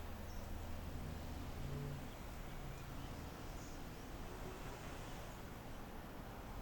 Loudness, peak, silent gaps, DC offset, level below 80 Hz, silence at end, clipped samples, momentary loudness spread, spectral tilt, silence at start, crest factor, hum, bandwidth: -50 LUFS; -34 dBFS; none; under 0.1%; -52 dBFS; 0 s; under 0.1%; 4 LU; -5.5 dB/octave; 0 s; 14 dB; none; over 20 kHz